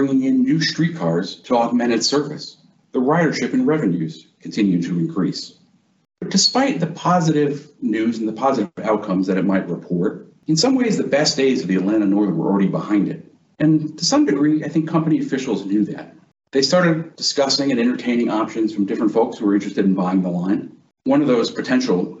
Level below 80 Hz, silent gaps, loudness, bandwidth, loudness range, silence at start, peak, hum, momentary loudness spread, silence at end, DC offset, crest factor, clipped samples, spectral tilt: -64 dBFS; none; -19 LUFS; 8.2 kHz; 2 LU; 0 s; -4 dBFS; none; 8 LU; 0 s; under 0.1%; 16 dB; under 0.1%; -5 dB/octave